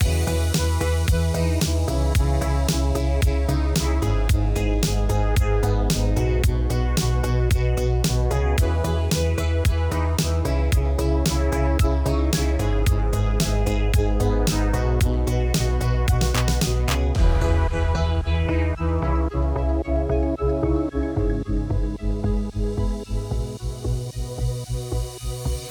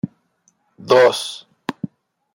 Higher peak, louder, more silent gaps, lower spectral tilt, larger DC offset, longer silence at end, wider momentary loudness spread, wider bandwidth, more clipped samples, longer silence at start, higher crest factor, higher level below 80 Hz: second, -6 dBFS vs -2 dBFS; second, -23 LUFS vs -17 LUFS; neither; first, -6 dB/octave vs -4 dB/octave; neither; second, 0 s vs 0.5 s; second, 6 LU vs 19 LU; first, over 20 kHz vs 16 kHz; neither; about the same, 0 s vs 0.05 s; about the same, 14 dB vs 18 dB; first, -24 dBFS vs -68 dBFS